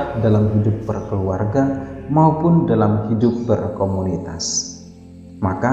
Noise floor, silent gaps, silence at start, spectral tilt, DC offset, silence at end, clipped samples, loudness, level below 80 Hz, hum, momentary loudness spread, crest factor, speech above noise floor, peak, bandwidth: -39 dBFS; none; 0 s; -6.5 dB/octave; under 0.1%; 0 s; under 0.1%; -19 LUFS; -44 dBFS; none; 9 LU; 16 dB; 22 dB; -2 dBFS; 8.2 kHz